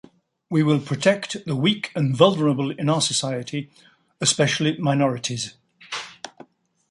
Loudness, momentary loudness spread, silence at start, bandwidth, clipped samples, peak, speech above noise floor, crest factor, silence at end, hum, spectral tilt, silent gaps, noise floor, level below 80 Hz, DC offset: -22 LUFS; 15 LU; 0.5 s; 11.5 kHz; under 0.1%; -2 dBFS; 28 dB; 22 dB; 0.6 s; none; -4.5 dB/octave; none; -50 dBFS; -64 dBFS; under 0.1%